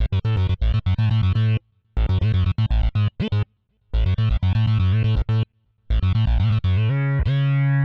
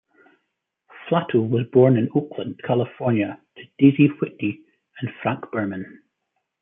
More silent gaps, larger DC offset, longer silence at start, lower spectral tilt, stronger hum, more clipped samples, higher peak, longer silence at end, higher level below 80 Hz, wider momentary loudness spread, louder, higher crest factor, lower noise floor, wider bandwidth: neither; neither; second, 0 s vs 0.95 s; second, -9 dB/octave vs -12 dB/octave; neither; neither; second, -12 dBFS vs -2 dBFS; second, 0 s vs 0.75 s; first, -26 dBFS vs -68 dBFS; second, 6 LU vs 17 LU; about the same, -21 LUFS vs -21 LUFS; second, 8 dB vs 20 dB; second, -58 dBFS vs -77 dBFS; first, 5.2 kHz vs 3.7 kHz